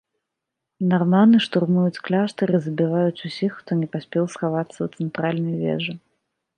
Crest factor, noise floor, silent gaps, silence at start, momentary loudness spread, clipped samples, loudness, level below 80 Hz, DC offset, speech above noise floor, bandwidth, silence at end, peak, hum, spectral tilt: 18 dB; -82 dBFS; none; 0.8 s; 11 LU; under 0.1%; -22 LUFS; -68 dBFS; under 0.1%; 62 dB; 9.6 kHz; 0.6 s; -4 dBFS; none; -7.5 dB/octave